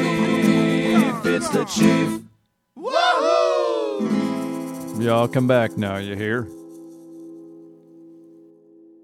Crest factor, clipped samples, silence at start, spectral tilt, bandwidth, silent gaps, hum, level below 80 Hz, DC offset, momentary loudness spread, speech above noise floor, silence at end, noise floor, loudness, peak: 18 dB; under 0.1%; 0 s; -5.5 dB/octave; 16 kHz; none; none; -60 dBFS; under 0.1%; 23 LU; 38 dB; 0.9 s; -58 dBFS; -20 LUFS; -4 dBFS